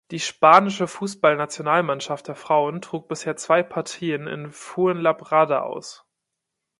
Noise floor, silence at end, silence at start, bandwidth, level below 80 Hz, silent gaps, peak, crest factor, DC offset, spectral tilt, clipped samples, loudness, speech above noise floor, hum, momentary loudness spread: -82 dBFS; 0.85 s; 0.1 s; 11.5 kHz; -72 dBFS; none; 0 dBFS; 22 dB; under 0.1%; -4.5 dB/octave; under 0.1%; -21 LUFS; 60 dB; none; 16 LU